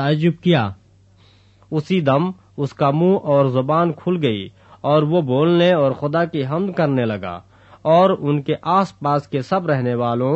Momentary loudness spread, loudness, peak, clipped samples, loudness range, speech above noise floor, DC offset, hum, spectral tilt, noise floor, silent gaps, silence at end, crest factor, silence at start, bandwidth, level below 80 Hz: 12 LU; -18 LUFS; -2 dBFS; under 0.1%; 2 LU; 34 dB; under 0.1%; none; -8.5 dB/octave; -51 dBFS; none; 0 s; 16 dB; 0 s; 8 kHz; -60 dBFS